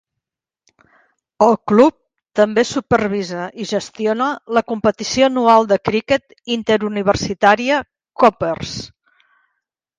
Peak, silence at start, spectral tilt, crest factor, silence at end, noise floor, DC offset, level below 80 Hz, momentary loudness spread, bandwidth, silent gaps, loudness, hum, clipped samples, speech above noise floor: 0 dBFS; 1.4 s; -5 dB/octave; 18 dB; 1.15 s; -83 dBFS; under 0.1%; -48 dBFS; 11 LU; 9.6 kHz; none; -17 LUFS; none; under 0.1%; 67 dB